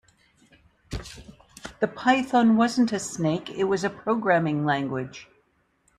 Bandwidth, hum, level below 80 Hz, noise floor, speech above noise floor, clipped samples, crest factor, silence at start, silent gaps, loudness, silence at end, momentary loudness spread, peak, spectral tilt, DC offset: 12.5 kHz; none; -52 dBFS; -67 dBFS; 43 dB; under 0.1%; 20 dB; 0.9 s; none; -24 LUFS; 0.75 s; 21 LU; -6 dBFS; -5.5 dB/octave; under 0.1%